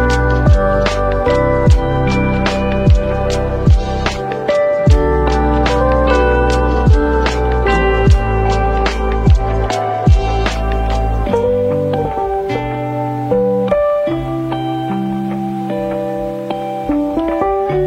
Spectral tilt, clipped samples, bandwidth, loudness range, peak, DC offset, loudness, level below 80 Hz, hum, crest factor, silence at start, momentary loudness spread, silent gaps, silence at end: -7 dB/octave; under 0.1%; 9.2 kHz; 4 LU; 0 dBFS; under 0.1%; -15 LUFS; -18 dBFS; none; 14 dB; 0 s; 7 LU; none; 0 s